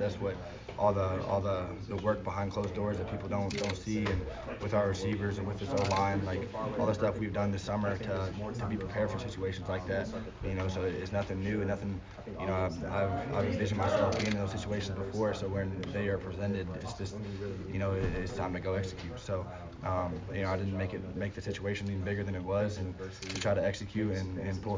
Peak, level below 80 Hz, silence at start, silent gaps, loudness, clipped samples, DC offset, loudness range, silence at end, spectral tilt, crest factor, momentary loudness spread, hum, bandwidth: -16 dBFS; -48 dBFS; 0 s; none; -34 LUFS; under 0.1%; under 0.1%; 3 LU; 0 s; -6.5 dB/octave; 18 dB; 8 LU; none; 7.6 kHz